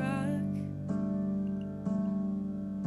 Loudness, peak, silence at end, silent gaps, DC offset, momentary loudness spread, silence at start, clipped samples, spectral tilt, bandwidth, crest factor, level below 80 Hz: -34 LUFS; -18 dBFS; 0 s; none; under 0.1%; 4 LU; 0 s; under 0.1%; -9 dB/octave; 11.5 kHz; 14 dB; -60 dBFS